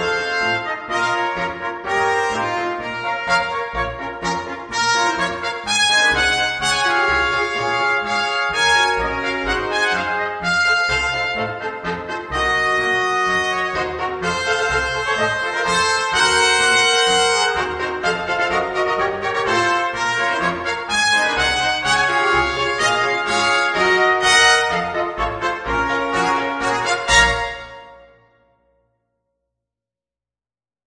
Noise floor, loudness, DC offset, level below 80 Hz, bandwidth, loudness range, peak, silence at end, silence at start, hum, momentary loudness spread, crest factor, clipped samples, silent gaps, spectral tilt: under -90 dBFS; -17 LUFS; under 0.1%; -40 dBFS; 10.5 kHz; 5 LU; -2 dBFS; 2.85 s; 0 s; none; 10 LU; 18 dB; under 0.1%; none; -2 dB/octave